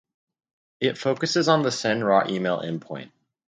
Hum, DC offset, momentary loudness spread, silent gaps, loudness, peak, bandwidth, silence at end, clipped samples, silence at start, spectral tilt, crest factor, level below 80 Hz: none; under 0.1%; 12 LU; none; -23 LUFS; -4 dBFS; 9.4 kHz; 0.4 s; under 0.1%; 0.8 s; -4.5 dB/octave; 22 dB; -70 dBFS